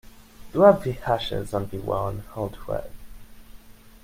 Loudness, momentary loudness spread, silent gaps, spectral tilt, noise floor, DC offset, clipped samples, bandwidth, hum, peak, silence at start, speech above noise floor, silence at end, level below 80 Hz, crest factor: -24 LUFS; 15 LU; none; -7 dB/octave; -46 dBFS; under 0.1%; under 0.1%; 16 kHz; none; -2 dBFS; 0.05 s; 23 dB; 0.15 s; -44 dBFS; 24 dB